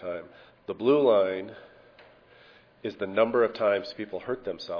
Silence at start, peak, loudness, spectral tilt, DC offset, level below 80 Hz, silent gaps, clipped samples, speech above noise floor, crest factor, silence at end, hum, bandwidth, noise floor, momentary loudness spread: 0 s; -10 dBFS; -26 LUFS; -7 dB/octave; under 0.1%; -68 dBFS; none; under 0.1%; 30 dB; 18 dB; 0 s; none; 5.4 kHz; -56 dBFS; 17 LU